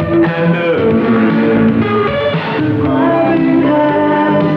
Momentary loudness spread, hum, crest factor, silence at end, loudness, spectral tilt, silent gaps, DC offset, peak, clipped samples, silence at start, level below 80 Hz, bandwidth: 3 LU; none; 10 dB; 0 s; -12 LUFS; -9.5 dB/octave; none; under 0.1%; -2 dBFS; under 0.1%; 0 s; -42 dBFS; 5.6 kHz